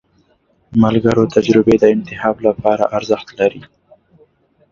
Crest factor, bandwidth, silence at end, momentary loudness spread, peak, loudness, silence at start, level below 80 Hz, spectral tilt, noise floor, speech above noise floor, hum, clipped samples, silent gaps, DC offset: 16 dB; 7.6 kHz; 1.1 s; 7 LU; 0 dBFS; -15 LUFS; 0.7 s; -46 dBFS; -7 dB/octave; -58 dBFS; 44 dB; none; under 0.1%; none; under 0.1%